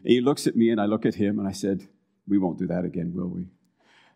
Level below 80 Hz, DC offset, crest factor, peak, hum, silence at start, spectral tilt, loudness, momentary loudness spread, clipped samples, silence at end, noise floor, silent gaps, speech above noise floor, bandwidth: -64 dBFS; under 0.1%; 20 dB; -6 dBFS; none; 0.05 s; -6.5 dB/octave; -25 LUFS; 11 LU; under 0.1%; 0.65 s; -60 dBFS; none; 36 dB; 16 kHz